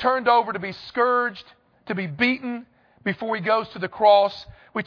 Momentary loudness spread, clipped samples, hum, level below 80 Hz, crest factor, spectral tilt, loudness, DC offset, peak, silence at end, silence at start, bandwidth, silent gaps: 15 LU; under 0.1%; none; -62 dBFS; 18 dB; -7 dB/octave; -22 LUFS; under 0.1%; -4 dBFS; 0.05 s; 0 s; 5.4 kHz; none